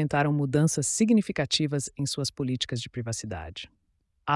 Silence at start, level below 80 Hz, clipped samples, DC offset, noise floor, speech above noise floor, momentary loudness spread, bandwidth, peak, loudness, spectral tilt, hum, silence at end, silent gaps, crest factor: 0 s; -56 dBFS; under 0.1%; under 0.1%; -72 dBFS; 45 dB; 14 LU; 12 kHz; -10 dBFS; -27 LUFS; -4.5 dB/octave; none; 0 s; none; 16 dB